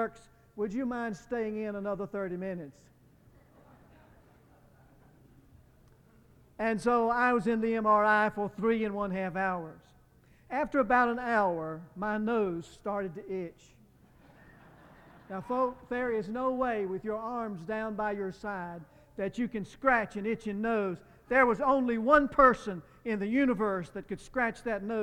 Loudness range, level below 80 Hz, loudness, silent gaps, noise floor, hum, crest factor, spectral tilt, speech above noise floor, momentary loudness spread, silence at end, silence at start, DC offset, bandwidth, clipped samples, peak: 11 LU; -58 dBFS; -30 LUFS; none; -61 dBFS; none; 22 dB; -7 dB/octave; 31 dB; 14 LU; 0 s; 0 s; under 0.1%; 11.5 kHz; under 0.1%; -10 dBFS